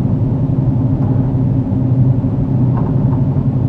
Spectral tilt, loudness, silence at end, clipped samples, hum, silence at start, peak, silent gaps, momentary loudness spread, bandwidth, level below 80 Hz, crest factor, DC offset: -12.5 dB/octave; -15 LUFS; 0 s; under 0.1%; none; 0 s; -2 dBFS; none; 2 LU; 2.8 kHz; -30 dBFS; 12 dB; under 0.1%